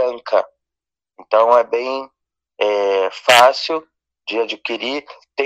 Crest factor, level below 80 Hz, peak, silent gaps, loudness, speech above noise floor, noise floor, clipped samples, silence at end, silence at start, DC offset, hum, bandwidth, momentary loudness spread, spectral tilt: 18 dB; -68 dBFS; 0 dBFS; none; -17 LUFS; 70 dB; -87 dBFS; under 0.1%; 0 s; 0 s; under 0.1%; none; 16 kHz; 16 LU; -1.5 dB/octave